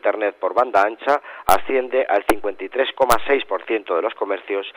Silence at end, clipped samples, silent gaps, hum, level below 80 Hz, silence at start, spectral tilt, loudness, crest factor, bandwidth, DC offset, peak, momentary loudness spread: 0 s; under 0.1%; none; none; -46 dBFS; 0 s; -3 dB/octave; -20 LUFS; 20 dB; over 20 kHz; under 0.1%; 0 dBFS; 6 LU